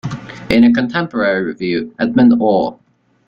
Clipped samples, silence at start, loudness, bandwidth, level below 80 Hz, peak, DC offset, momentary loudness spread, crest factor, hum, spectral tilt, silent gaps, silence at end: under 0.1%; 0.05 s; -14 LUFS; 6.8 kHz; -44 dBFS; 0 dBFS; under 0.1%; 10 LU; 14 dB; none; -7.5 dB/octave; none; 0.55 s